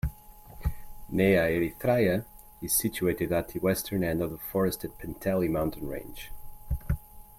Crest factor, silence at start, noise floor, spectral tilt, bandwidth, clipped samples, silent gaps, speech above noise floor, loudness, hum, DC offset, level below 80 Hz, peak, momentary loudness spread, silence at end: 18 dB; 0.05 s; -49 dBFS; -5.5 dB/octave; 16.5 kHz; under 0.1%; none; 21 dB; -29 LUFS; none; under 0.1%; -42 dBFS; -10 dBFS; 14 LU; 0.15 s